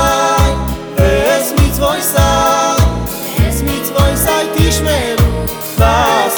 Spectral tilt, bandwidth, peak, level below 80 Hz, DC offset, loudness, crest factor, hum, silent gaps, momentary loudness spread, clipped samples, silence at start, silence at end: -4.5 dB/octave; over 20 kHz; 0 dBFS; -18 dBFS; under 0.1%; -13 LUFS; 12 dB; none; none; 5 LU; under 0.1%; 0 s; 0 s